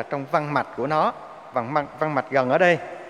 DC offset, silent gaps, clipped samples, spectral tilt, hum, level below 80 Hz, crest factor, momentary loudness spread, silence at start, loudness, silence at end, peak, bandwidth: under 0.1%; none; under 0.1%; -6.5 dB/octave; none; -64 dBFS; 18 dB; 9 LU; 0 s; -23 LUFS; 0 s; -4 dBFS; 10.5 kHz